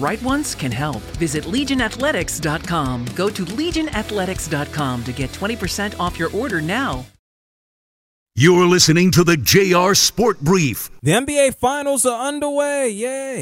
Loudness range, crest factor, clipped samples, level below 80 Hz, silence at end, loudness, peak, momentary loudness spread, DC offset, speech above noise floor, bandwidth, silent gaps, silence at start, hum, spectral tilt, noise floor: 8 LU; 18 dB; under 0.1%; -40 dBFS; 0 s; -18 LUFS; 0 dBFS; 11 LU; under 0.1%; over 72 dB; 16.5 kHz; 7.19-8.26 s; 0 s; none; -4 dB/octave; under -90 dBFS